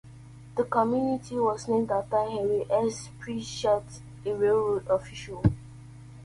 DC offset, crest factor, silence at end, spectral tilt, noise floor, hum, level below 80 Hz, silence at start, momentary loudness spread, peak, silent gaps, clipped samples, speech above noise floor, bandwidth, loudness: under 0.1%; 18 dB; 0 s; -6.5 dB/octave; -47 dBFS; none; -50 dBFS; 0.05 s; 14 LU; -10 dBFS; none; under 0.1%; 20 dB; 11.5 kHz; -28 LUFS